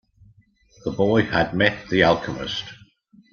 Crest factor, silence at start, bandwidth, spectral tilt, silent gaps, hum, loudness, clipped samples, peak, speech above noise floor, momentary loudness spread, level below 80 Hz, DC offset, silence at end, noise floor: 22 dB; 0.85 s; 7 kHz; -6 dB/octave; none; none; -21 LUFS; under 0.1%; -2 dBFS; 36 dB; 13 LU; -50 dBFS; under 0.1%; 0.6 s; -56 dBFS